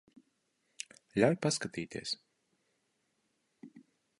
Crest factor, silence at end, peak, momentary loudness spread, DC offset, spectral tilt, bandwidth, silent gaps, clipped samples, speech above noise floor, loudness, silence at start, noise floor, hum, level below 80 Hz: 24 dB; 0.4 s; -14 dBFS; 18 LU; under 0.1%; -4.5 dB/octave; 11.5 kHz; none; under 0.1%; 47 dB; -34 LUFS; 1.15 s; -79 dBFS; none; -72 dBFS